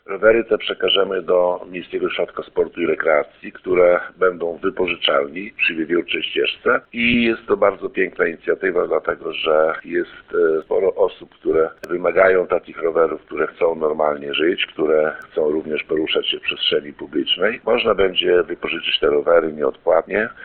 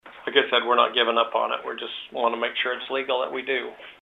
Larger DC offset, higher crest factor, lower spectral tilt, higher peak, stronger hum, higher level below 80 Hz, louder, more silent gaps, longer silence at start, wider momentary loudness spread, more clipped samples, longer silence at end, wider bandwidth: neither; about the same, 18 dB vs 22 dB; first, -6.5 dB/octave vs -4.5 dB/octave; about the same, 0 dBFS vs -2 dBFS; neither; first, -50 dBFS vs -74 dBFS; first, -19 LUFS vs -24 LUFS; neither; about the same, 0.1 s vs 0.05 s; second, 8 LU vs 11 LU; neither; about the same, 0 s vs 0.1 s; second, 4.5 kHz vs 6.8 kHz